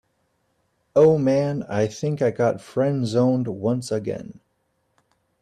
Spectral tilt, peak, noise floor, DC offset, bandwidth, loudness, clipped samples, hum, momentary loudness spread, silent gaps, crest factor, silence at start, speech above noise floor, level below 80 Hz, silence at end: -7.5 dB/octave; -6 dBFS; -70 dBFS; under 0.1%; 11 kHz; -22 LUFS; under 0.1%; none; 10 LU; none; 16 dB; 0.95 s; 50 dB; -60 dBFS; 1.1 s